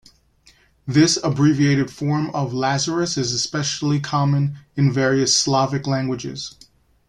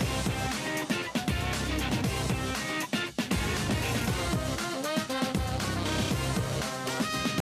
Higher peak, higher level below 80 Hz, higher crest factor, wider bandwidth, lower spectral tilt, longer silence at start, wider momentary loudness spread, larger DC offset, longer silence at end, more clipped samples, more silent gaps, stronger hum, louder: first, -4 dBFS vs -16 dBFS; second, -54 dBFS vs -42 dBFS; about the same, 16 dB vs 14 dB; second, 11 kHz vs 16 kHz; about the same, -4.5 dB/octave vs -4.5 dB/octave; first, 0.85 s vs 0 s; first, 9 LU vs 2 LU; neither; first, 0.6 s vs 0 s; neither; neither; neither; first, -20 LUFS vs -30 LUFS